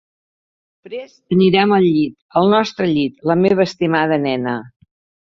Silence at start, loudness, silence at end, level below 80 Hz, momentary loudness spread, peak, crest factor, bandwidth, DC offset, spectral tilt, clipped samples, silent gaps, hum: 0.85 s; -16 LUFS; 0.65 s; -56 dBFS; 15 LU; 0 dBFS; 16 dB; 7.4 kHz; under 0.1%; -7 dB/octave; under 0.1%; 2.22-2.29 s; none